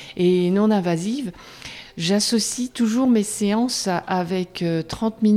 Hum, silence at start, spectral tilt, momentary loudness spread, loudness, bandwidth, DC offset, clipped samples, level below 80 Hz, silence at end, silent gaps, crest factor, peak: none; 0 s; -5 dB/octave; 11 LU; -21 LUFS; 15 kHz; under 0.1%; under 0.1%; -54 dBFS; 0 s; none; 14 dB; -8 dBFS